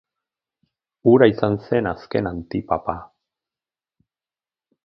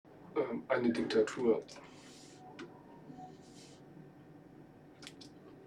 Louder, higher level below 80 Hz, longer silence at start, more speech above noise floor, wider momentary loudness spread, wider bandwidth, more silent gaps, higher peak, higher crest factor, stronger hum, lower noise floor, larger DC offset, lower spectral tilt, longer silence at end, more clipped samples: first, -20 LUFS vs -34 LUFS; first, -50 dBFS vs -74 dBFS; first, 1.05 s vs 0.1 s; first, over 71 dB vs 24 dB; second, 14 LU vs 24 LU; second, 5.8 kHz vs 11 kHz; neither; first, 0 dBFS vs -18 dBFS; about the same, 22 dB vs 22 dB; neither; first, under -90 dBFS vs -57 dBFS; neither; first, -9.5 dB/octave vs -5.5 dB/octave; first, 1.8 s vs 0.05 s; neither